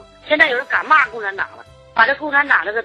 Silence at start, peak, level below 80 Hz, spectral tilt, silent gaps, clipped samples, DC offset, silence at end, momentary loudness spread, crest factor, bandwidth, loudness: 0.25 s; 0 dBFS; -56 dBFS; -3.5 dB/octave; none; under 0.1%; under 0.1%; 0 s; 10 LU; 18 dB; 10.5 kHz; -15 LUFS